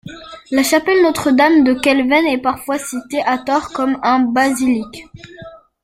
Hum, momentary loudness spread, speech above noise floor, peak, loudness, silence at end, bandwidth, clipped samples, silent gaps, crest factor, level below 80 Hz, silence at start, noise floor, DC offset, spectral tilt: none; 19 LU; 23 dB; 0 dBFS; -15 LUFS; 0.25 s; 16 kHz; under 0.1%; none; 16 dB; -50 dBFS; 0.05 s; -38 dBFS; under 0.1%; -3.5 dB/octave